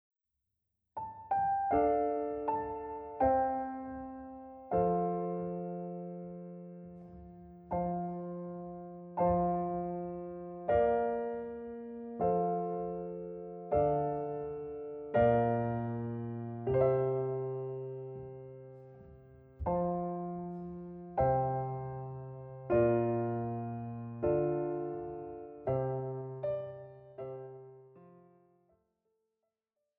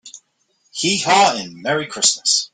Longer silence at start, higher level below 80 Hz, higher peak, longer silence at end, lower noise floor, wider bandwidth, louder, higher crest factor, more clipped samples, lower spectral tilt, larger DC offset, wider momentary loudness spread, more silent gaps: first, 0.95 s vs 0.05 s; about the same, -58 dBFS vs -62 dBFS; second, -16 dBFS vs 0 dBFS; first, 1.8 s vs 0.1 s; first, -88 dBFS vs -64 dBFS; second, 3.8 kHz vs 11 kHz; second, -35 LUFS vs -16 LUFS; about the same, 20 dB vs 20 dB; neither; first, -12 dB/octave vs -1.5 dB/octave; neither; first, 17 LU vs 9 LU; neither